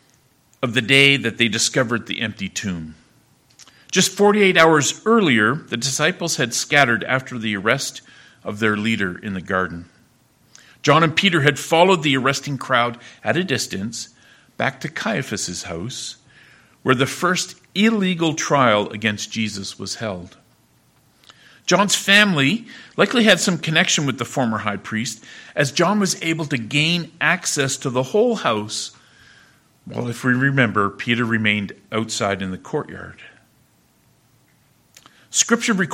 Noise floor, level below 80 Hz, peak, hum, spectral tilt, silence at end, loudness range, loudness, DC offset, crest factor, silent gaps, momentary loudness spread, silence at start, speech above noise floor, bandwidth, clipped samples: -58 dBFS; -60 dBFS; 0 dBFS; none; -3.5 dB/octave; 0 s; 8 LU; -19 LUFS; under 0.1%; 20 dB; none; 14 LU; 0.6 s; 39 dB; 16.5 kHz; under 0.1%